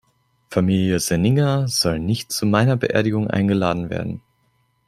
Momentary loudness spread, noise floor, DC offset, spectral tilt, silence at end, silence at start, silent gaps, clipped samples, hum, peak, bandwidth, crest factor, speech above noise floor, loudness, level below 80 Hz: 8 LU; -64 dBFS; under 0.1%; -5.5 dB/octave; 0.7 s; 0.5 s; none; under 0.1%; none; -2 dBFS; 15.5 kHz; 18 dB; 46 dB; -20 LUFS; -48 dBFS